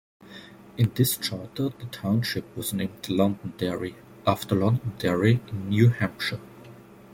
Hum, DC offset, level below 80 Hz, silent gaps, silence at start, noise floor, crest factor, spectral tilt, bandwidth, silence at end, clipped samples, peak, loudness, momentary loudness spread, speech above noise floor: none; under 0.1%; -58 dBFS; none; 0.25 s; -47 dBFS; 20 dB; -6 dB/octave; 16.5 kHz; 0 s; under 0.1%; -6 dBFS; -26 LUFS; 16 LU; 22 dB